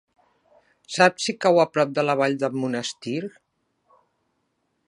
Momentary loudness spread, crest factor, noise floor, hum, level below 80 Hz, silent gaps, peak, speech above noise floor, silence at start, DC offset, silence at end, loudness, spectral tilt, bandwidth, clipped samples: 12 LU; 24 dB; -73 dBFS; none; -76 dBFS; none; -2 dBFS; 51 dB; 0.9 s; under 0.1%; 1.6 s; -22 LUFS; -4.5 dB/octave; 11.5 kHz; under 0.1%